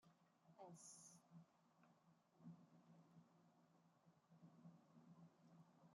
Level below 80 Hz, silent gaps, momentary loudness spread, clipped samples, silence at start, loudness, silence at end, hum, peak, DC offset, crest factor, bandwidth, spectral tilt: under -90 dBFS; none; 7 LU; under 0.1%; 0 s; -66 LUFS; 0 s; none; -50 dBFS; under 0.1%; 18 dB; 11.5 kHz; -5 dB/octave